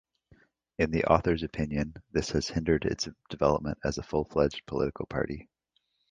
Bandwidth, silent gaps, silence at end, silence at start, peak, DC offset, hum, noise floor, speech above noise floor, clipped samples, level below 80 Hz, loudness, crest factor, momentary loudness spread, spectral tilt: 9.6 kHz; none; 0.7 s; 0.8 s; -6 dBFS; under 0.1%; none; -76 dBFS; 47 dB; under 0.1%; -46 dBFS; -30 LUFS; 24 dB; 9 LU; -6 dB/octave